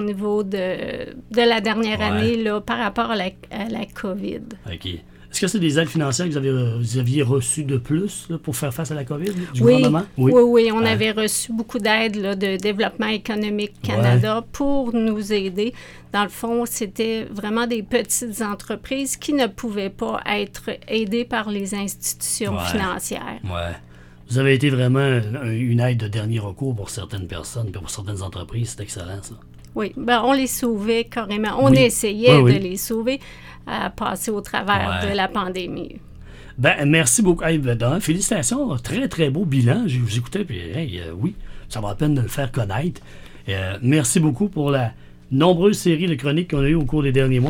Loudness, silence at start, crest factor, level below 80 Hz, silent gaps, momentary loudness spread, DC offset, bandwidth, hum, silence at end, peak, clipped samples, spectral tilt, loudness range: -21 LUFS; 0 s; 20 dB; -42 dBFS; none; 13 LU; under 0.1%; 18 kHz; none; 0 s; 0 dBFS; under 0.1%; -5 dB/octave; 7 LU